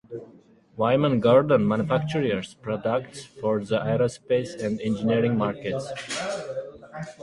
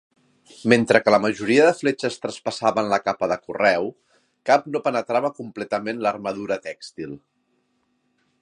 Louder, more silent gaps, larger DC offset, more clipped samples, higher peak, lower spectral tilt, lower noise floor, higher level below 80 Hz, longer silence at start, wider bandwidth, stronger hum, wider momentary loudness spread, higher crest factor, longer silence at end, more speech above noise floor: second, -25 LUFS vs -21 LUFS; neither; neither; neither; second, -6 dBFS vs 0 dBFS; first, -6.5 dB/octave vs -5 dB/octave; second, -53 dBFS vs -69 dBFS; first, -58 dBFS vs -66 dBFS; second, 0.1 s vs 0.6 s; about the same, 11.5 kHz vs 11.5 kHz; neither; about the same, 17 LU vs 16 LU; about the same, 18 dB vs 22 dB; second, 0 s vs 1.25 s; second, 29 dB vs 48 dB